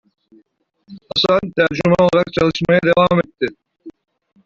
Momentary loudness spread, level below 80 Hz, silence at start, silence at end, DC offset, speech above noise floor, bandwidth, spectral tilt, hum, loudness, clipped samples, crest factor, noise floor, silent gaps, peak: 9 LU; -48 dBFS; 0.9 s; 0.55 s; under 0.1%; 45 dB; 7.6 kHz; -6.5 dB/octave; none; -16 LUFS; under 0.1%; 16 dB; -60 dBFS; none; -2 dBFS